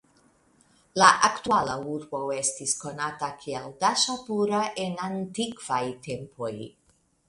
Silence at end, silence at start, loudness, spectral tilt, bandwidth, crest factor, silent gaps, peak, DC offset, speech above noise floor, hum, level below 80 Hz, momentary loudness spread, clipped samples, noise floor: 0.6 s; 0.95 s; -26 LUFS; -2.5 dB/octave; 11.5 kHz; 26 dB; none; -2 dBFS; under 0.1%; 36 dB; none; -64 dBFS; 16 LU; under 0.1%; -62 dBFS